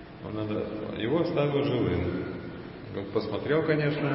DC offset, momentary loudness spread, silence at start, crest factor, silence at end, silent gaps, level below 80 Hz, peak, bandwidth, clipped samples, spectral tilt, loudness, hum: under 0.1%; 12 LU; 0 s; 16 dB; 0 s; none; -50 dBFS; -14 dBFS; 5.8 kHz; under 0.1%; -11 dB/octave; -29 LUFS; none